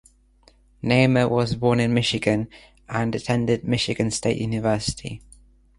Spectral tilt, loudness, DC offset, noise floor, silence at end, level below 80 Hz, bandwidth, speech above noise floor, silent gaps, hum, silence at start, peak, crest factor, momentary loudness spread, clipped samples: -5.5 dB/octave; -22 LUFS; under 0.1%; -57 dBFS; 0.6 s; -48 dBFS; 11.5 kHz; 35 dB; none; none; 0.85 s; -4 dBFS; 20 dB; 12 LU; under 0.1%